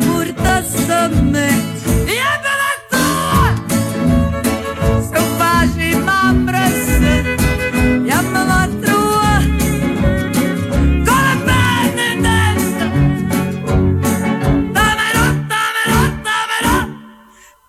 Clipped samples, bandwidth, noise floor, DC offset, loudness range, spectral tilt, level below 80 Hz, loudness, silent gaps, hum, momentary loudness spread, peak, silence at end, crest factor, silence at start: under 0.1%; 16.5 kHz; -45 dBFS; under 0.1%; 1 LU; -5 dB/octave; -24 dBFS; -14 LUFS; none; none; 4 LU; -2 dBFS; 0.55 s; 12 dB; 0 s